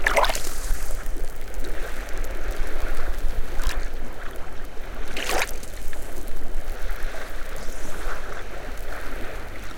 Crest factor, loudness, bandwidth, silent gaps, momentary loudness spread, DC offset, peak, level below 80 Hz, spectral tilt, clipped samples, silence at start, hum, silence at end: 16 dB; -32 LUFS; 16.5 kHz; none; 11 LU; under 0.1%; -4 dBFS; -26 dBFS; -3 dB/octave; under 0.1%; 0 s; none; 0 s